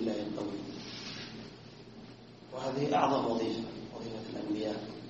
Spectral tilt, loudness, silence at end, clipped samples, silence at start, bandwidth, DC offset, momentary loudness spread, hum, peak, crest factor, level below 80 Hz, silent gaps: -4.5 dB/octave; -35 LUFS; 0 s; under 0.1%; 0 s; 8 kHz; under 0.1%; 21 LU; none; -12 dBFS; 22 dB; -66 dBFS; none